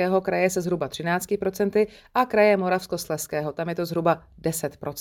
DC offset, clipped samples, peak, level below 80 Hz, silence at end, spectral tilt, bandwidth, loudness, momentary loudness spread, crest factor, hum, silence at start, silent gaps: under 0.1%; under 0.1%; -6 dBFS; -56 dBFS; 0 s; -5 dB/octave; 18.5 kHz; -24 LUFS; 9 LU; 18 dB; none; 0 s; none